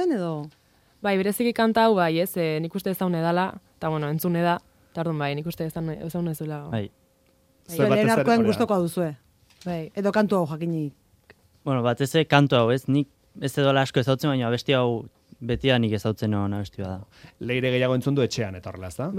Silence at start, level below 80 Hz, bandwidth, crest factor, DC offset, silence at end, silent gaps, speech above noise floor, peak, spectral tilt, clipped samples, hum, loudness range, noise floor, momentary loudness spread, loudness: 0 s; -56 dBFS; 16.5 kHz; 22 dB; under 0.1%; 0 s; none; 39 dB; -2 dBFS; -6.5 dB/octave; under 0.1%; none; 5 LU; -62 dBFS; 13 LU; -24 LUFS